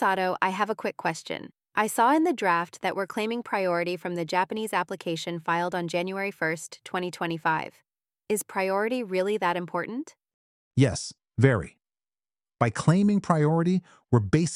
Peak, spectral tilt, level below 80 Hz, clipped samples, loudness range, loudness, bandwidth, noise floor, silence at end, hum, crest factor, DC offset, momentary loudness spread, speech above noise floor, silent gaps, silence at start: -4 dBFS; -6 dB/octave; -60 dBFS; under 0.1%; 4 LU; -27 LUFS; 15.5 kHz; under -90 dBFS; 0 s; none; 22 dB; under 0.1%; 9 LU; over 64 dB; 10.34-10.71 s; 0 s